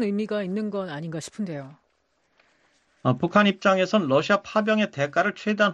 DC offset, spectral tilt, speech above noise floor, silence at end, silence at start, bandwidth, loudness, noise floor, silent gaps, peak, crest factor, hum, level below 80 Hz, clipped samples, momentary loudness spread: under 0.1%; -6 dB/octave; 46 dB; 0 s; 0 s; 10.5 kHz; -24 LUFS; -70 dBFS; none; -4 dBFS; 20 dB; none; -68 dBFS; under 0.1%; 12 LU